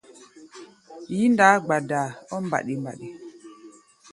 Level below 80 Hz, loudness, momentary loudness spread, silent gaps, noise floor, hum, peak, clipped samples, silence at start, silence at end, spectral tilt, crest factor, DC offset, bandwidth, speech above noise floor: -70 dBFS; -22 LUFS; 26 LU; none; -50 dBFS; none; 0 dBFS; under 0.1%; 0.2 s; 0.45 s; -5.5 dB/octave; 24 dB; under 0.1%; 11.5 kHz; 27 dB